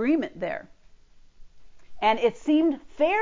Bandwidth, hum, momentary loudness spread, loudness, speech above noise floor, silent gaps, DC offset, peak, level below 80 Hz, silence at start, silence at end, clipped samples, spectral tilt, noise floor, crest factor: 7.6 kHz; none; 10 LU; -25 LUFS; 28 dB; none; under 0.1%; -10 dBFS; -58 dBFS; 0 s; 0 s; under 0.1%; -5.5 dB/octave; -51 dBFS; 16 dB